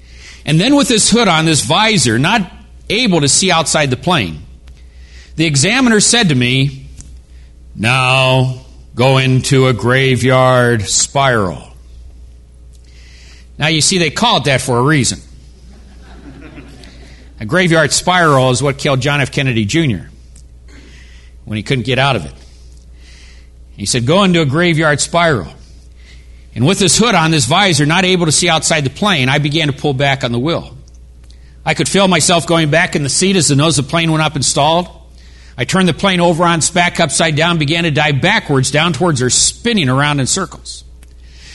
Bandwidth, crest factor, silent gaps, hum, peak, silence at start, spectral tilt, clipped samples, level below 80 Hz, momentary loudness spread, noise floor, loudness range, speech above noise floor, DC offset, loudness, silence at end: 12 kHz; 14 dB; none; none; 0 dBFS; 0.1 s; -4 dB/octave; under 0.1%; -38 dBFS; 9 LU; -38 dBFS; 6 LU; 26 dB; under 0.1%; -12 LUFS; 0 s